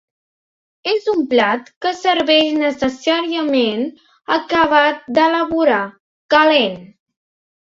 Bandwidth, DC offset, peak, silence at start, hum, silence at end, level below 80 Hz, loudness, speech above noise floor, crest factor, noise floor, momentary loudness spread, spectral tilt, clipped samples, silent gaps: 7.8 kHz; under 0.1%; 0 dBFS; 0.85 s; none; 0.9 s; -56 dBFS; -16 LUFS; over 74 dB; 16 dB; under -90 dBFS; 10 LU; -4 dB/octave; under 0.1%; 1.76-1.81 s, 6.00-6.29 s